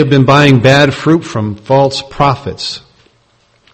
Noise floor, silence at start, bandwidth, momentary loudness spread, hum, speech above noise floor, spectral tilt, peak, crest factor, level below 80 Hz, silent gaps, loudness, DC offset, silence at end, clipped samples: -53 dBFS; 0 s; 8.8 kHz; 13 LU; none; 43 dB; -6 dB/octave; 0 dBFS; 10 dB; -40 dBFS; none; -10 LUFS; under 0.1%; 0.95 s; 0.6%